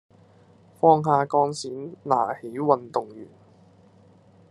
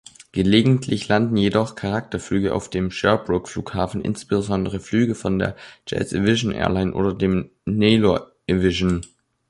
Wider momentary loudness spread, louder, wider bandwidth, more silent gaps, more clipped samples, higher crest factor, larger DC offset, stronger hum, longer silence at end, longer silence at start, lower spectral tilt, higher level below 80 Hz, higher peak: first, 16 LU vs 9 LU; about the same, -23 LUFS vs -21 LUFS; about the same, 11.5 kHz vs 11.5 kHz; neither; neither; about the same, 22 dB vs 18 dB; neither; neither; first, 1.25 s vs 0.45 s; first, 0.85 s vs 0.35 s; about the same, -6.5 dB/octave vs -6 dB/octave; second, -72 dBFS vs -42 dBFS; about the same, -4 dBFS vs -2 dBFS